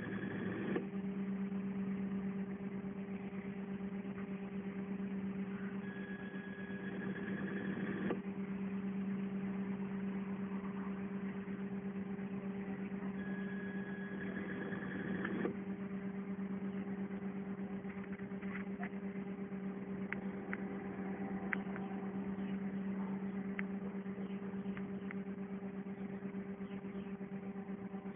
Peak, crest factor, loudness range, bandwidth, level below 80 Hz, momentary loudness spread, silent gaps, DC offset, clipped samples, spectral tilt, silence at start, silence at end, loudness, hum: -18 dBFS; 24 dB; 2 LU; 3.6 kHz; -70 dBFS; 5 LU; none; under 0.1%; under 0.1%; -5.5 dB/octave; 0 s; 0 s; -43 LUFS; none